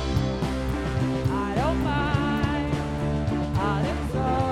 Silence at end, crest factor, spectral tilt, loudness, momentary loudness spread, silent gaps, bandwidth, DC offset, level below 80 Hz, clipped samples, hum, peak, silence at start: 0 s; 16 dB; -7 dB/octave; -26 LUFS; 3 LU; none; 15 kHz; under 0.1%; -34 dBFS; under 0.1%; none; -10 dBFS; 0 s